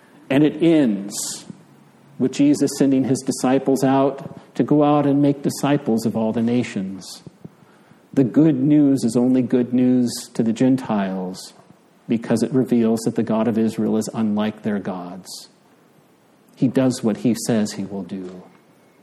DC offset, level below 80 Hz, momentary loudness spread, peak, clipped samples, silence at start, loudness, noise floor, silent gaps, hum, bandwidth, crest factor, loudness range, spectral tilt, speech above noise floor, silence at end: under 0.1%; -66 dBFS; 15 LU; -4 dBFS; under 0.1%; 0.3 s; -19 LUFS; -54 dBFS; none; none; 13.5 kHz; 16 dB; 5 LU; -6 dB/octave; 35 dB; 0.6 s